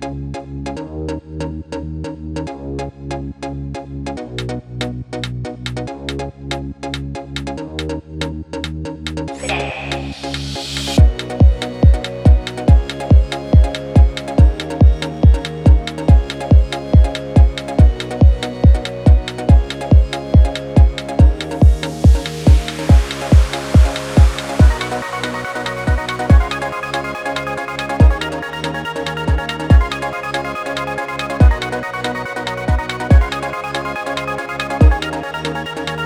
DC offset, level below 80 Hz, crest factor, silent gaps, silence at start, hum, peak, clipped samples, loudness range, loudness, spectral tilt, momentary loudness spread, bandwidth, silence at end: under 0.1%; -18 dBFS; 14 dB; none; 0 s; none; 0 dBFS; under 0.1%; 11 LU; -17 LUFS; -6.5 dB/octave; 12 LU; 11 kHz; 0 s